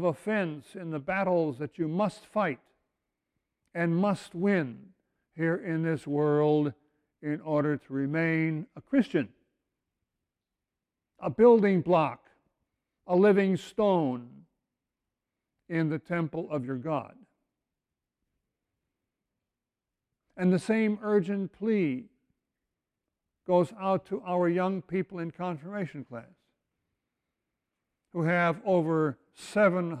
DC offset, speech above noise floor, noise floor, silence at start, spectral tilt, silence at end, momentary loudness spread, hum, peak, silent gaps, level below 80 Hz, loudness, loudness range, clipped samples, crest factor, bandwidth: under 0.1%; 62 dB; -89 dBFS; 0 s; -8 dB/octave; 0 s; 13 LU; none; -10 dBFS; none; -72 dBFS; -28 LUFS; 8 LU; under 0.1%; 20 dB; 11 kHz